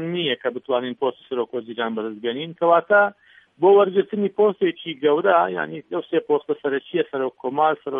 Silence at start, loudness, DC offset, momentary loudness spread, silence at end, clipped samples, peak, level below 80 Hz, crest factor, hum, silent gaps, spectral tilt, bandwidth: 0 s; -21 LUFS; under 0.1%; 11 LU; 0 s; under 0.1%; -4 dBFS; -78 dBFS; 18 dB; none; none; -8.5 dB/octave; 3.8 kHz